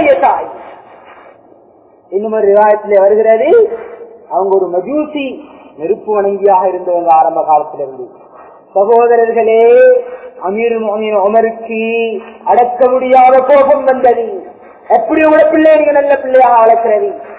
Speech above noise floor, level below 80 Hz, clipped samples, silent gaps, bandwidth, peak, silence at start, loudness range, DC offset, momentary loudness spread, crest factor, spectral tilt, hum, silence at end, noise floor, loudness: 35 dB; -54 dBFS; 0.3%; none; 4 kHz; 0 dBFS; 0 s; 4 LU; under 0.1%; 15 LU; 10 dB; -9 dB/octave; none; 0 s; -44 dBFS; -10 LUFS